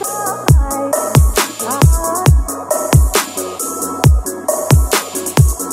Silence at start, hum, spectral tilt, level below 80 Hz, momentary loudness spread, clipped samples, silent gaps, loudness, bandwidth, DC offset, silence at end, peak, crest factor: 0 s; none; -5 dB/octave; -18 dBFS; 7 LU; under 0.1%; none; -14 LUFS; 16.5 kHz; under 0.1%; 0 s; 0 dBFS; 14 dB